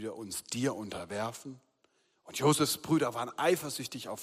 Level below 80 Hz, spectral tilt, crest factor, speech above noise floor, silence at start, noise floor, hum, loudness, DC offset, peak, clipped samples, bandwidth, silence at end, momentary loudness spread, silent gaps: -72 dBFS; -4 dB/octave; 20 dB; 40 dB; 0 s; -73 dBFS; none; -32 LUFS; under 0.1%; -14 dBFS; under 0.1%; 15.5 kHz; 0 s; 12 LU; none